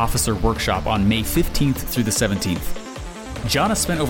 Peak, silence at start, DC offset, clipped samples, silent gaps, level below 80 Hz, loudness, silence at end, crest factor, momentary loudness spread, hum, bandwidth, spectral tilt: -6 dBFS; 0 s; under 0.1%; under 0.1%; none; -30 dBFS; -20 LUFS; 0 s; 14 dB; 13 LU; none; 17 kHz; -4.5 dB/octave